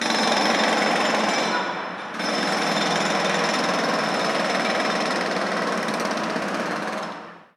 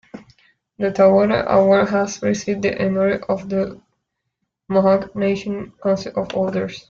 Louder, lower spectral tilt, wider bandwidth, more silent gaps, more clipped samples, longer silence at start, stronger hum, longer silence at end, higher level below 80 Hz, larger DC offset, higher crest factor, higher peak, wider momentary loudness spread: second, -22 LUFS vs -19 LUFS; second, -3 dB/octave vs -6.5 dB/octave; first, 15.5 kHz vs 7.4 kHz; neither; neither; second, 0 s vs 0.15 s; neither; about the same, 0.15 s vs 0.1 s; second, -70 dBFS vs -52 dBFS; neither; about the same, 18 dB vs 16 dB; about the same, -4 dBFS vs -4 dBFS; about the same, 8 LU vs 10 LU